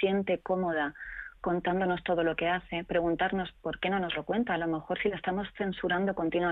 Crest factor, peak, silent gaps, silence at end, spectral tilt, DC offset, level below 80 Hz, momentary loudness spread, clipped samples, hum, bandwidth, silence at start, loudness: 14 dB; -16 dBFS; none; 0 s; -9 dB/octave; under 0.1%; -56 dBFS; 6 LU; under 0.1%; none; 4.1 kHz; 0 s; -31 LUFS